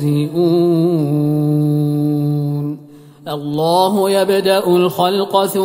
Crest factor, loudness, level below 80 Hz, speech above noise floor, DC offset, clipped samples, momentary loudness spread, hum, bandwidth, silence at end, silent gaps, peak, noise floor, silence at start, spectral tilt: 14 dB; -15 LUFS; -62 dBFS; 25 dB; under 0.1%; under 0.1%; 9 LU; none; 16.5 kHz; 0 s; none; 0 dBFS; -39 dBFS; 0 s; -7 dB/octave